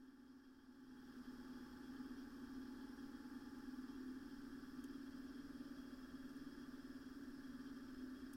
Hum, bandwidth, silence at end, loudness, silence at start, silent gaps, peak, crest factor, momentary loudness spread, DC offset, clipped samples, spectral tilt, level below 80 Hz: none; 16.5 kHz; 0 s; -55 LUFS; 0 s; none; -42 dBFS; 12 dB; 6 LU; under 0.1%; under 0.1%; -5.5 dB/octave; -70 dBFS